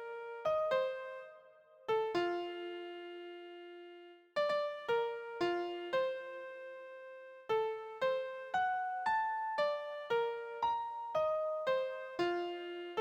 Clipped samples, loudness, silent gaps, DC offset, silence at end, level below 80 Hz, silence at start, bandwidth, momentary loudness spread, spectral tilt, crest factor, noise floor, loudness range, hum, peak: under 0.1%; -37 LUFS; none; under 0.1%; 0 s; -78 dBFS; 0 s; 16.5 kHz; 15 LU; -4.5 dB/octave; 16 dB; -61 dBFS; 4 LU; none; -22 dBFS